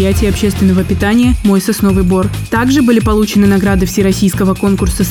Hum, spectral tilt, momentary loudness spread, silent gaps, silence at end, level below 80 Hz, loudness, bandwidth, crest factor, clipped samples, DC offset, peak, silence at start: none; -6 dB/octave; 3 LU; none; 0 s; -22 dBFS; -11 LUFS; 18 kHz; 10 dB; under 0.1%; 0.3%; 0 dBFS; 0 s